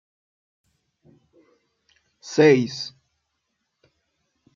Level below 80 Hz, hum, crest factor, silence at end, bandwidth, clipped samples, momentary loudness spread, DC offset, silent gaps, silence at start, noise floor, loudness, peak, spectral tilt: -74 dBFS; none; 22 dB; 1.65 s; 7.4 kHz; under 0.1%; 20 LU; under 0.1%; none; 2.25 s; -77 dBFS; -20 LUFS; -4 dBFS; -5.5 dB/octave